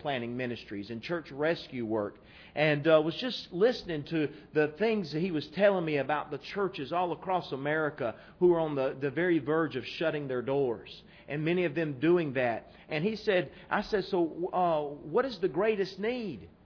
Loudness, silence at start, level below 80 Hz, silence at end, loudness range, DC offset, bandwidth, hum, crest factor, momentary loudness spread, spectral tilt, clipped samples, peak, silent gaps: -31 LUFS; 0 s; -64 dBFS; 0.15 s; 2 LU; under 0.1%; 5.4 kHz; none; 20 dB; 10 LU; -7.5 dB/octave; under 0.1%; -12 dBFS; none